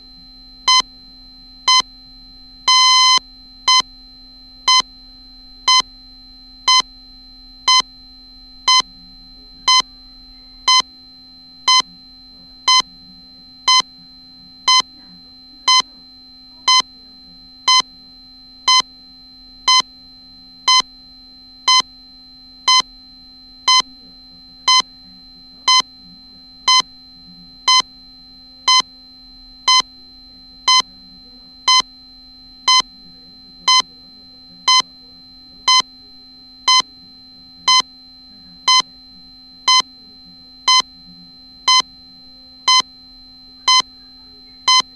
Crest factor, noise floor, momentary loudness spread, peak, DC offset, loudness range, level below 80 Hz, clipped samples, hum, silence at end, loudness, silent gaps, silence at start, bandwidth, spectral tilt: 18 dB; -42 dBFS; 17 LU; -2 dBFS; under 0.1%; 3 LU; -52 dBFS; under 0.1%; none; 0.15 s; -14 LUFS; none; 0.65 s; 13 kHz; 2.5 dB/octave